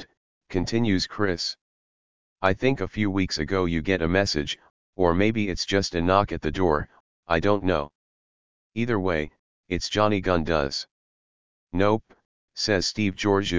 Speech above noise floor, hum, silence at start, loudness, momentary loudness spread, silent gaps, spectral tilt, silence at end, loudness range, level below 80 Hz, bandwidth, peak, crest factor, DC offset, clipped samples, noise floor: over 66 dB; none; 0 s; -25 LUFS; 10 LU; 0.17-0.41 s, 1.61-2.36 s, 4.70-4.93 s, 7.00-7.23 s, 7.95-8.70 s, 9.39-9.64 s, 10.91-11.67 s, 12.25-12.48 s; -5 dB/octave; 0 s; 3 LU; -42 dBFS; 7.6 kHz; -4 dBFS; 20 dB; 1%; under 0.1%; under -90 dBFS